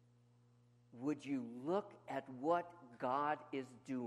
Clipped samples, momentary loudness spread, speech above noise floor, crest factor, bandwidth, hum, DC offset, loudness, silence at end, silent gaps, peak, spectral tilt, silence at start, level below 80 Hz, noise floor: under 0.1%; 9 LU; 28 dB; 18 dB; 11.5 kHz; 60 Hz at -70 dBFS; under 0.1%; -42 LUFS; 0 s; none; -24 dBFS; -6.5 dB/octave; 0.95 s; -88 dBFS; -70 dBFS